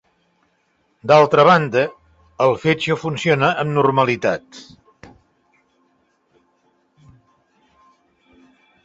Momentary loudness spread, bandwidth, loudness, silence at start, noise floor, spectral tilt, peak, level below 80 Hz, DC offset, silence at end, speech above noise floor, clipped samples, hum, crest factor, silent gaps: 10 LU; 8 kHz; -16 LUFS; 1.05 s; -65 dBFS; -6 dB/octave; -2 dBFS; -58 dBFS; under 0.1%; 4.2 s; 48 dB; under 0.1%; none; 20 dB; none